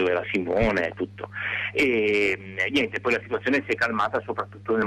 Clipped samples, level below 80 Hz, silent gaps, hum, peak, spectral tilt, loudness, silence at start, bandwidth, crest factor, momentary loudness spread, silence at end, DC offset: under 0.1%; -46 dBFS; none; 50 Hz at -45 dBFS; -12 dBFS; -5.5 dB/octave; -25 LUFS; 0 s; 13.5 kHz; 12 dB; 9 LU; 0 s; under 0.1%